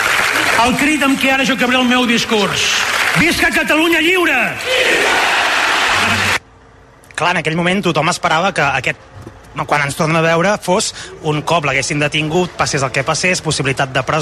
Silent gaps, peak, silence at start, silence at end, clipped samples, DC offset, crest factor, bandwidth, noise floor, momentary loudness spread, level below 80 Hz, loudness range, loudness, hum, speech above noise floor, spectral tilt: none; -2 dBFS; 0 s; 0 s; under 0.1%; under 0.1%; 12 dB; 14 kHz; -43 dBFS; 6 LU; -44 dBFS; 4 LU; -13 LUFS; none; 29 dB; -3.5 dB/octave